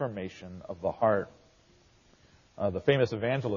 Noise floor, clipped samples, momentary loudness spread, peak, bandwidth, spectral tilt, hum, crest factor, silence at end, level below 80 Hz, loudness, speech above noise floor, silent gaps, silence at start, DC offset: -62 dBFS; under 0.1%; 16 LU; -10 dBFS; 7.2 kHz; -5 dB/octave; none; 20 dB; 0 s; -62 dBFS; -30 LUFS; 32 dB; none; 0 s; under 0.1%